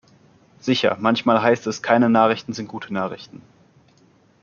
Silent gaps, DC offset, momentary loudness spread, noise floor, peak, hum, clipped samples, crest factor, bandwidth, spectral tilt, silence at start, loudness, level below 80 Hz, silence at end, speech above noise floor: none; under 0.1%; 14 LU; -56 dBFS; -2 dBFS; none; under 0.1%; 20 dB; 7.2 kHz; -5.5 dB/octave; 0.65 s; -20 LUFS; -66 dBFS; 1.05 s; 37 dB